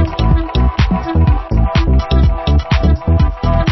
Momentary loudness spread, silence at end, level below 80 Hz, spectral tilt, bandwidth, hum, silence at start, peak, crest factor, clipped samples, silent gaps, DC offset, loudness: 2 LU; 0 s; -14 dBFS; -8 dB/octave; 6 kHz; none; 0 s; 0 dBFS; 12 dB; under 0.1%; none; under 0.1%; -14 LUFS